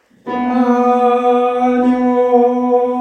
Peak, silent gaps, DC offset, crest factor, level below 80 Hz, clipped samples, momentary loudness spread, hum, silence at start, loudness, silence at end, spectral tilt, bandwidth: 0 dBFS; none; under 0.1%; 12 dB; -56 dBFS; under 0.1%; 4 LU; none; 0.25 s; -13 LUFS; 0 s; -6.5 dB/octave; 6.6 kHz